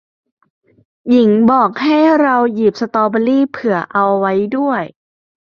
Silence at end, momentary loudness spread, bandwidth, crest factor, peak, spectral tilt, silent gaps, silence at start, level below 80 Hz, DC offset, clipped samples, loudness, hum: 0.65 s; 7 LU; 6.8 kHz; 14 dB; -2 dBFS; -7.5 dB/octave; none; 1.05 s; -58 dBFS; under 0.1%; under 0.1%; -13 LUFS; none